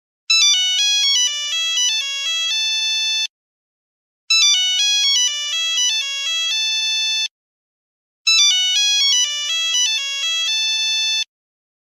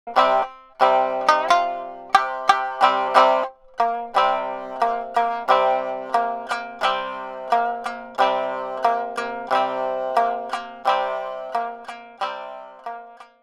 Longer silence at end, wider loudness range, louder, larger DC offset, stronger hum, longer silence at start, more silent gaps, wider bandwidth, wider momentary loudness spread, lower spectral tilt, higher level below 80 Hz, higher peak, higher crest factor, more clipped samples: first, 0.75 s vs 0.2 s; about the same, 3 LU vs 5 LU; first, -15 LUFS vs -22 LUFS; neither; neither; first, 0.3 s vs 0.05 s; first, 3.30-4.28 s, 7.31-8.25 s vs none; first, 15.5 kHz vs 13.5 kHz; second, 7 LU vs 13 LU; second, 9 dB/octave vs -2.5 dB/octave; second, -86 dBFS vs -62 dBFS; about the same, -2 dBFS vs 0 dBFS; second, 16 dB vs 22 dB; neither